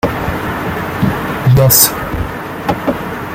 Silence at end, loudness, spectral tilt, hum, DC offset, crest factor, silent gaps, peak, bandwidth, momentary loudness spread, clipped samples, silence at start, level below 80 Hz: 0 s; -13 LUFS; -4.5 dB/octave; none; under 0.1%; 14 dB; none; 0 dBFS; 17 kHz; 13 LU; 0.1%; 0.05 s; -32 dBFS